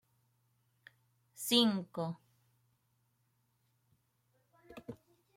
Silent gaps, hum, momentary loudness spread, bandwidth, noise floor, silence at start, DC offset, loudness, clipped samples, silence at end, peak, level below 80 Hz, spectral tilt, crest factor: none; none; 24 LU; 16.5 kHz; -78 dBFS; 1.4 s; under 0.1%; -33 LUFS; under 0.1%; 0.4 s; -14 dBFS; -82 dBFS; -4 dB/octave; 28 dB